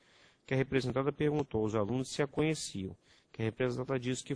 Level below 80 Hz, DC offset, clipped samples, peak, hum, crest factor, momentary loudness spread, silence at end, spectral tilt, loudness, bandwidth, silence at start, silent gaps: -62 dBFS; under 0.1%; under 0.1%; -16 dBFS; none; 18 dB; 7 LU; 0 s; -6 dB/octave; -34 LUFS; 10.5 kHz; 0.5 s; none